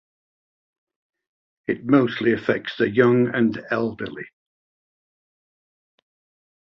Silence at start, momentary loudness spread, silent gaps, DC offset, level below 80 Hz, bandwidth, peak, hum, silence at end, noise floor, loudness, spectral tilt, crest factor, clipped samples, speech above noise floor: 1.7 s; 16 LU; none; under 0.1%; -62 dBFS; 6.2 kHz; -2 dBFS; none; 2.4 s; under -90 dBFS; -21 LUFS; -8.5 dB/octave; 22 dB; under 0.1%; over 69 dB